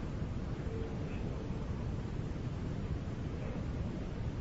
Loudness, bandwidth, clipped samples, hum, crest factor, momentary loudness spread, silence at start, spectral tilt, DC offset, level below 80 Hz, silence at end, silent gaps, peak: -40 LUFS; 7.6 kHz; under 0.1%; none; 12 dB; 1 LU; 0 s; -8 dB/octave; under 0.1%; -44 dBFS; 0 s; none; -26 dBFS